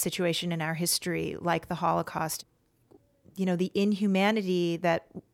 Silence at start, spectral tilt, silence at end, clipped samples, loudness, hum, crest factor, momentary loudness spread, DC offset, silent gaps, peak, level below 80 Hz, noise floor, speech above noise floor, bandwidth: 0 s; -4.5 dB/octave; 0.15 s; under 0.1%; -29 LUFS; none; 16 dB; 7 LU; under 0.1%; none; -12 dBFS; -64 dBFS; -62 dBFS; 33 dB; 17 kHz